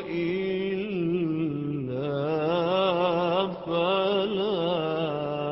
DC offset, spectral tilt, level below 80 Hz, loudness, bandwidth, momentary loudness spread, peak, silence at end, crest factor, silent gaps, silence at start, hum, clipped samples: under 0.1%; -10.5 dB/octave; -60 dBFS; -27 LUFS; 5.8 kHz; 5 LU; -10 dBFS; 0 s; 16 dB; none; 0 s; none; under 0.1%